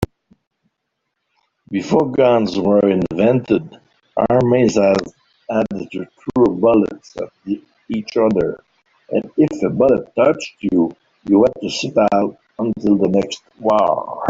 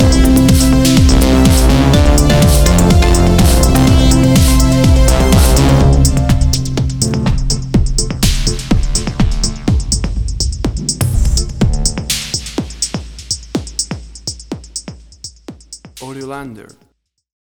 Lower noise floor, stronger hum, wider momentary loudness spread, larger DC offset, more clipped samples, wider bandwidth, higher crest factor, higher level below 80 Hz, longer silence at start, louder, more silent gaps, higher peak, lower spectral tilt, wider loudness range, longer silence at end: first, -75 dBFS vs -61 dBFS; neither; second, 12 LU vs 17 LU; neither; neither; second, 8 kHz vs over 20 kHz; about the same, 16 dB vs 12 dB; second, -50 dBFS vs -14 dBFS; about the same, 0 s vs 0 s; second, -17 LUFS vs -12 LUFS; first, 0.47-0.51 s vs none; about the same, -2 dBFS vs 0 dBFS; first, -6.5 dB/octave vs -5 dB/octave; second, 3 LU vs 14 LU; second, 0 s vs 0.8 s